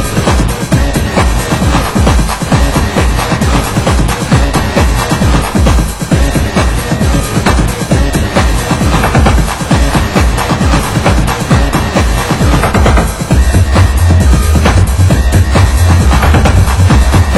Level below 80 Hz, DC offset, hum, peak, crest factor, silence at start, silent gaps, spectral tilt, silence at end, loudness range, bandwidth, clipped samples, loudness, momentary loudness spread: -12 dBFS; under 0.1%; none; 0 dBFS; 8 dB; 0 s; none; -5.5 dB/octave; 0 s; 3 LU; 16 kHz; 1%; -10 LUFS; 4 LU